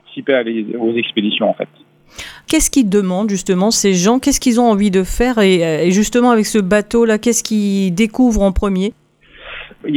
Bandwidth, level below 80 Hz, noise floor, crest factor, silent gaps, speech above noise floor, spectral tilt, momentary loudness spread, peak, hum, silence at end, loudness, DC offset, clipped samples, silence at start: 18 kHz; -32 dBFS; -39 dBFS; 14 dB; none; 26 dB; -4.5 dB/octave; 10 LU; 0 dBFS; none; 0 s; -14 LUFS; under 0.1%; under 0.1%; 0.1 s